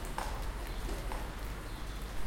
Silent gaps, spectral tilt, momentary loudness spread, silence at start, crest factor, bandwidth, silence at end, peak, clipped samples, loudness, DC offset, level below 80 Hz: none; -4.5 dB/octave; 4 LU; 0 s; 16 dB; 17 kHz; 0 s; -20 dBFS; under 0.1%; -42 LUFS; under 0.1%; -40 dBFS